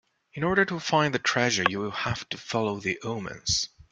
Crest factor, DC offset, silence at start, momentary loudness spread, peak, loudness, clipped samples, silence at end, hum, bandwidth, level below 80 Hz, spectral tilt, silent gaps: 24 dB; under 0.1%; 0.35 s; 8 LU; -2 dBFS; -26 LUFS; under 0.1%; 0.25 s; none; 9.6 kHz; -54 dBFS; -3.5 dB/octave; none